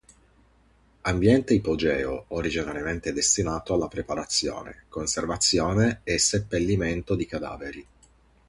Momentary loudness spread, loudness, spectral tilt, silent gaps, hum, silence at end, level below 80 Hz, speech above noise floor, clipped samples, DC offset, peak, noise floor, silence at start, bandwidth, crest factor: 11 LU; -25 LUFS; -4 dB/octave; none; none; 0.65 s; -44 dBFS; 35 dB; under 0.1%; under 0.1%; -8 dBFS; -60 dBFS; 1.05 s; 11.5 kHz; 18 dB